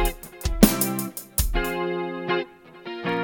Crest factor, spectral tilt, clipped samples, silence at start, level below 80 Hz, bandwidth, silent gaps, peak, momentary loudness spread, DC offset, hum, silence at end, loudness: 24 dB; -4.5 dB/octave; under 0.1%; 0 s; -32 dBFS; 17.5 kHz; none; 0 dBFS; 15 LU; under 0.1%; none; 0 s; -24 LUFS